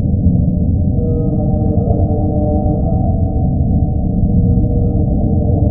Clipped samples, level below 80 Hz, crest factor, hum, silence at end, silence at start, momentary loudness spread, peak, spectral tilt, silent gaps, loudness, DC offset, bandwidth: under 0.1%; -18 dBFS; 12 dB; none; 0 s; 0 s; 2 LU; 0 dBFS; -19.5 dB/octave; none; -15 LUFS; under 0.1%; 1.3 kHz